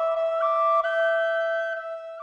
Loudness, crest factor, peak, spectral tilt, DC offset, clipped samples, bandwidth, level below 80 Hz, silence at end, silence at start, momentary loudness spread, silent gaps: -24 LUFS; 12 dB; -14 dBFS; 1 dB/octave; under 0.1%; under 0.1%; 7.6 kHz; -72 dBFS; 0 s; 0 s; 9 LU; none